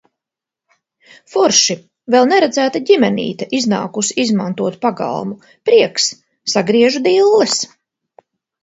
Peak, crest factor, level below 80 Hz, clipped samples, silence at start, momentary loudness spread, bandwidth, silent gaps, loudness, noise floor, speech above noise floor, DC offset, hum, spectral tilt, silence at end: 0 dBFS; 16 dB; -62 dBFS; under 0.1%; 1.3 s; 11 LU; 8 kHz; none; -14 LUFS; -85 dBFS; 71 dB; under 0.1%; none; -3 dB/octave; 0.95 s